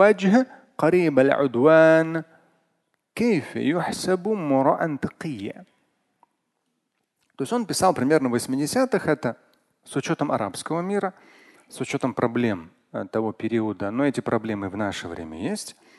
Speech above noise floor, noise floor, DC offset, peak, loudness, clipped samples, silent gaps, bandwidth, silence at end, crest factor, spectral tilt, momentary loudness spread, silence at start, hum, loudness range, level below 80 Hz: 53 dB; -76 dBFS; under 0.1%; -4 dBFS; -23 LUFS; under 0.1%; none; 12.5 kHz; 0.3 s; 20 dB; -5.5 dB/octave; 14 LU; 0 s; none; 7 LU; -60 dBFS